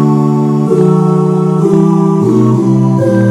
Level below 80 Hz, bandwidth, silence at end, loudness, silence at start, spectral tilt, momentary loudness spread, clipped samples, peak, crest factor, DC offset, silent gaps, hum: -52 dBFS; 11.5 kHz; 0 s; -10 LUFS; 0 s; -9.5 dB/octave; 2 LU; 0.2%; 0 dBFS; 8 dB; under 0.1%; none; none